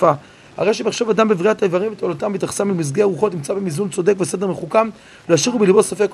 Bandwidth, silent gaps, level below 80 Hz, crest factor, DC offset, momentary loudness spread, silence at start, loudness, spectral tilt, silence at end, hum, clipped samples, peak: 13 kHz; none; -60 dBFS; 18 dB; under 0.1%; 8 LU; 0 s; -18 LUFS; -5 dB/octave; 0 s; none; under 0.1%; 0 dBFS